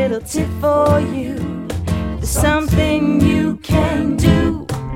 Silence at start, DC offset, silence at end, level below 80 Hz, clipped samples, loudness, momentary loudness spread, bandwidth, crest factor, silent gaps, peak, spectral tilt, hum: 0 s; under 0.1%; 0 s; -26 dBFS; under 0.1%; -17 LUFS; 9 LU; 16.5 kHz; 16 dB; none; 0 dBFS; -6 dB/octave; none